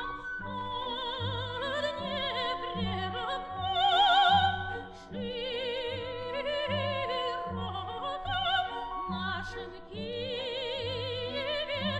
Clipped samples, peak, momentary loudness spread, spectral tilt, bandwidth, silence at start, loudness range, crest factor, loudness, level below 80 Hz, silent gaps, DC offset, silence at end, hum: under 0.1%; -14 dBFS; 11 LU; -5 dB/octave; 8.8 kHz; 0 s; 6 LU; 18 dB; -31 LUFS; -54 dBFS; none; under 0.1%; 0 s; none